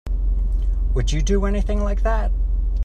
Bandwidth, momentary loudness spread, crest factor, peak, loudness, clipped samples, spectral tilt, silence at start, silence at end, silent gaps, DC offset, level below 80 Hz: 7.6 kHz; 3 LU; 12 dB; -8 dBFS; -23 LUFS; under 0.1%; -6.5 dB/octave; 0.05 s; 0 s; none; under 0.1%; -20 dBFS